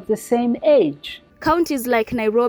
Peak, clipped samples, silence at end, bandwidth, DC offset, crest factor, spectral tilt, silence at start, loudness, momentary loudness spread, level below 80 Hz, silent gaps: -6 dBFS; under 0.1%; 0 s; over 20 kHz; under 0.1%; 12 dB; -5 dB/octave; 0 s; -19 LUFS; 9 LU; -48 dBFS; none